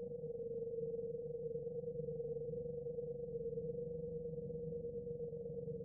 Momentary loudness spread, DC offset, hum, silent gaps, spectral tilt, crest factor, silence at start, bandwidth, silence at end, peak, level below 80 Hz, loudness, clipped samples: 2 LU; under 0.1%; none; none; 2.5 dB/octave; 12 dB; 0 s; 0.9 kHz; 0 s; -34 dBFS; -66 dBFS; -45 LUFS; under 0.1%